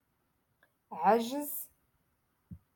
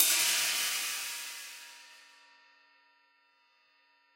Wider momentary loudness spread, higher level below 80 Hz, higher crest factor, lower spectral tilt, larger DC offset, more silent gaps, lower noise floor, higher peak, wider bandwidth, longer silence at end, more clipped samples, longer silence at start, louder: second, 20 LU vs 25 LU; first, -72 dBFS vs under -90 dBFS; second, 22 dB vs 28 dB; first, -4.5 dB/octave vs 3.5 dB/octave; neither; neither; first, -77 dBFS vs -69 dBFS; second, -14 dBFS vs -8 dBFS; about the same, 17.5 kHz vs 16.5 kHz; second, 0.2 s vs 2.2 s; neither; first, 0.9 s vs 0 s; about the same, -31 LUFS vs -29 LUFS